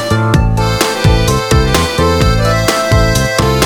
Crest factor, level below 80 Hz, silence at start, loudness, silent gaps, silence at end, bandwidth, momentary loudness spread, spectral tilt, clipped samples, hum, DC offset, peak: 10 dB; -18 dBFS; 0 s; -11 LUFS; none; 0 s; over 20 kHz; 1 LU; -5 dB/octave; under 0.1%; none; under 0.1%; 0 dBFS